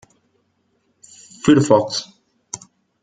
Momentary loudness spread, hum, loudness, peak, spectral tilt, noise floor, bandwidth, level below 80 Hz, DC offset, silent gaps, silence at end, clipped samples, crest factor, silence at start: 20 LU; none; -16 LUFS; 0 dBFS; -5.5 dB/octave; -66 dBFS; 9.4 kHz; -56 dBFS; under 0.1%; none; 0.45 s; under 0.1%; 20 dB; 1.45 s